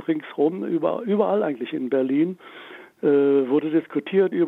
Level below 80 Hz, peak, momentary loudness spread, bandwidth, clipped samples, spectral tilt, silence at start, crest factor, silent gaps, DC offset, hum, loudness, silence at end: -76 dBFS; -6 dBFS; 9 LU; 4 kHz; under 0.1%; -9 dB/octave; 0 s; 16 dB; none; under 0.1%; none; -22 LUFS; 0 s